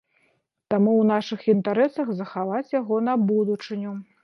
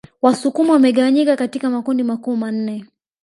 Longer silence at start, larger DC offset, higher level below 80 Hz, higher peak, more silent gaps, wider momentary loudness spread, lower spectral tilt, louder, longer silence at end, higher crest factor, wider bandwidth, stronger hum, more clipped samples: first, 0.7 s vs 0.25 s; neither; second, -76 dBFS vs -68 dBFS; second, -8 dBFS vs 0 dBFS; neither; about the same, 9 LU vs 10 LU; first, -8 dB/octave vs -5.5 dB/octave; second, -23 LUFS vs -17 LUFS; second, 0.2 s vs 0.4 s; about the same, 16 dB vs 16 dB; second, 6.4 kHz vs 11.5 kHz; neither; neither